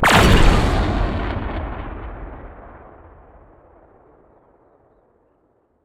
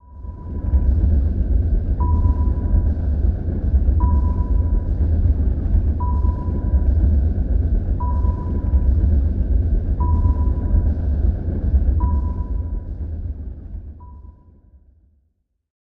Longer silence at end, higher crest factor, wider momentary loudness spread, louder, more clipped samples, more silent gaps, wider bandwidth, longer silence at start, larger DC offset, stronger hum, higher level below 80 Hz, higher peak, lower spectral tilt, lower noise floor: first, 3.1 s vs 1.7 s; first, 20 dB vs 12 dB; first, 27 LU vs 11 LU; first, -18 LUFS vs -21 LUFS; neither; neither; first, 16 kHz vs 1.8 kHz; about the same, 0 s vs 0.1 s; second, under 0.1% vs 0.3%; neither; about the same, -24 dBFS vs -20 dBFS; first, 0 dBFS vs -6 dBFS; second, -5 dB/octave vs -12.5 dB/octave; second, -62 dBFS vs -68 dBFS